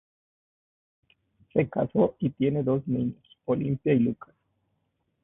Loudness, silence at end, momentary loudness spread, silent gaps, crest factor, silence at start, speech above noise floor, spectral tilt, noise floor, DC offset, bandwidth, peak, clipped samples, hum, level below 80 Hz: -27 LUFS; 1.1 s; 6 LU; none; 20 dB; 1.55 s; 50 dB; -12.5 dB/octave; -76 dBFS; under 0.1%; 3.8 kHz; -10 dBFS; under 0.1%; none; -60 dBFS